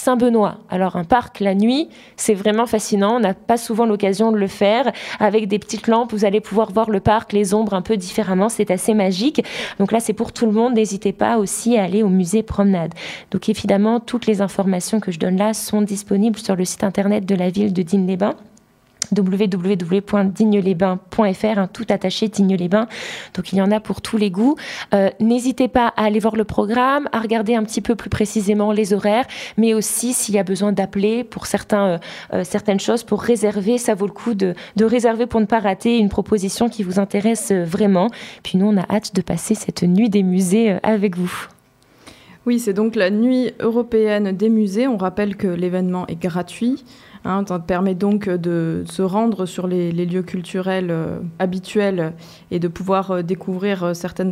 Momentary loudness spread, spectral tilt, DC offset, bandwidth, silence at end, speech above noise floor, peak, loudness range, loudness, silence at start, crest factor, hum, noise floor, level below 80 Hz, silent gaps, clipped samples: 7 LU; -5.5 dB/octave; under 0.1%; 15.5 kHz; 0 s; 34 dB; -2 dBFS; 3 LU; -19 LUFS; 0 s; 16 dB; none; -52 dBFS; -48 dBFS; none; under 0.1%